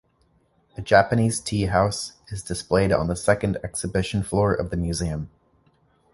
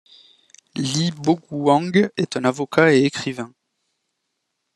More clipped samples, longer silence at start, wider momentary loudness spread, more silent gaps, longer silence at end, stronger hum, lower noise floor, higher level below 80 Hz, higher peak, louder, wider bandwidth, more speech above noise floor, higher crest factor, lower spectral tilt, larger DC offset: neither; about the same, 0.8 s vs 0.75 s; about the same, 14 LU vs 13 LU; neither; second, 0.85 s vs 1.3 s; neither; second, -64 dBFS vs -76 dBFS; first, -40 dBFS vs -64 dBFS; about the same, -2 dBFS vs 0 dBFS; second, -23 LUFS vs -19 LUFS; about the same, 11.5 kHz vs 12.5 kHz; second, 41 dB vs 57 dB; about the same, 22 dB vs 20 dB; about the same, -5.5 dB/octave vs -5.5 dB/octave; neither